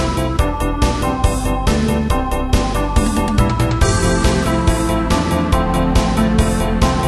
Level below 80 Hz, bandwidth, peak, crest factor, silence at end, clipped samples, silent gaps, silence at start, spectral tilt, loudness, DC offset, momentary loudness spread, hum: -20 dBFS; 13.5 kHz; 0 dBFS; 14 dB; 0 s; under 0.1%; none; 0 s; -5.5 dB/octave; -17 LUFS; under 0.1%; 3 LU; none